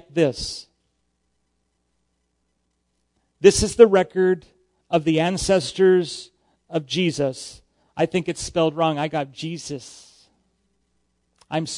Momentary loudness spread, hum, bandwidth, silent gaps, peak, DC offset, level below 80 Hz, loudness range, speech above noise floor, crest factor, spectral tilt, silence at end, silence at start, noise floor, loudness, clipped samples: 18 LU; none; 11 kHz; none; 0 dBFS; under 0.1%; -46 dBFS; 8 LU; 52 dB; 22 dB; -5 dB/octave; 0 s; 0.15 s; -72 dBFS; -21 LUFS; under 0.1%